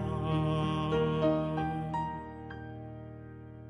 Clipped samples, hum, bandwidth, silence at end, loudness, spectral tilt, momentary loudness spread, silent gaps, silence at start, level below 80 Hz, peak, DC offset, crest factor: under 0.1%; none; 10 kHz; 0 s; -32 LUFS; -8.5 dB/octave; 17 LU; none; 0 s; -50 dBFS; -18 dBFS; under 0.1%; 16 dB